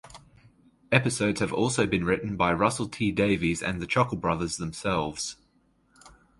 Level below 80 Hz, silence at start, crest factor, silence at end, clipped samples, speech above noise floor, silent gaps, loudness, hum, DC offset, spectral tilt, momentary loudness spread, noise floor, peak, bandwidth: -50 dBFS; 0.05 s; 26 dB; 0.3 s; under 0.1%; 40 dB; none; -26 LUFS; none; under 0.1%; -5 dB/octave; 6 LU; -66 dBFS; -2 dBFS; 11.5 kHz